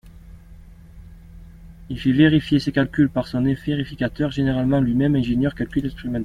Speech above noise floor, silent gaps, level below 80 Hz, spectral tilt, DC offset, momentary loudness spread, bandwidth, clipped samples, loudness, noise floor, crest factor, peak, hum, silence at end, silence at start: 23 dB; none; -40 dBFS; -8 dB/octave; under 0.1%; 9 LU; 10 kHz; under 0.1%; -20 LUFS; -43 dBFS; 18 dB; -4 dBFS; none; 0 s; 0.05 s